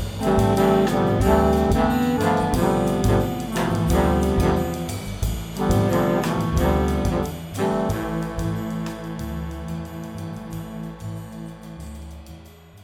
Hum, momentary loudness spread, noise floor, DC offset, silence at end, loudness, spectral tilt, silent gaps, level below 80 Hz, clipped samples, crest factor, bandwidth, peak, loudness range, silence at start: none; 16 LU; -44 dBFS; under 0.1%; 0 s; -22 LUFS; -6.5 dB/octave; none; -32 dBFS; under 0.1%; 16 dB; 18.5 kHz; -6 dBFS; 13 LU; 0 s